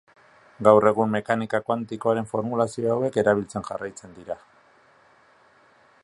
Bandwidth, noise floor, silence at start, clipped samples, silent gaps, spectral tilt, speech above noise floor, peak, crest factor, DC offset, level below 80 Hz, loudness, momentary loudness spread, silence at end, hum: 11.5 kHz; -57 dBFS; 0.6 s; under 0.1%; none; -6.5 dB/octave; 34 dB; -2 dBFS; 24 dB; under 0.1%; -62 dBFS; -23 LUFS; 19 LU; 1.65 s; none